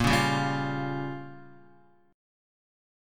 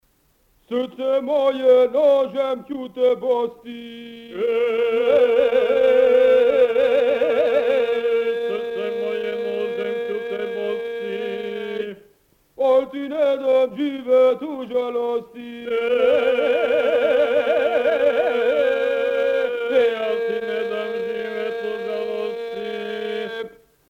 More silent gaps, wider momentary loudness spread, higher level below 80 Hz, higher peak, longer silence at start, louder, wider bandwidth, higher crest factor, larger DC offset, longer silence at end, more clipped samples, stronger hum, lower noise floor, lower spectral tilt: neither; first, 21 LU vs 12 LU; first, -48 dBFS vs -62 dBFS; second, -10 dBFS vs -6 dBFS; second, 0 s vs 0.7 s; second, -28 LUFS vs -20 LUFS; first, 17.5 kHz vs 6.8 kHz; first, 20 dB vs 14 dB; neither; first, 0.95 s vs 0.4 s; neither; neither; about the same, -60 dBFS vs -62 dBFS; about the same, -5 dB/octave vs -5 dB/octave